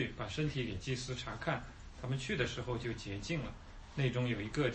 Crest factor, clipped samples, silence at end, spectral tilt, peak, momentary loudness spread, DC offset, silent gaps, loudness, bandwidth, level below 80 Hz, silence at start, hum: 18 dB; under 0.1%; 0 s; -5.5 dB/octave; -20 dBFS; 10 LU; under 0.1%; none; -39 LUFS; 8.4 kHz; -52 dBFS; 0 s; none